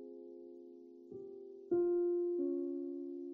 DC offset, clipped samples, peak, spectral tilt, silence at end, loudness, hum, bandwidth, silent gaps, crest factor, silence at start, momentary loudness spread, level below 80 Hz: under 0.1%; under 0.1%; -26 dBFS; -10.5 dB/octave; 0 s; -37 LUFS; none; 1.5 kHz; none; 14 dB; 0 s; 20 LU; -86 dBFS